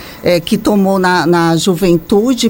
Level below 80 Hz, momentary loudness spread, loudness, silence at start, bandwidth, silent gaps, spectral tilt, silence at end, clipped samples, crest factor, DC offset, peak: -38 dBFS; 2 LU; -12 LUFS; 0 s; 17 kHz; none; -5.5 dB/octave; 0 s; under 0.1%; 12 dB; under 0.1%; 0 dBFS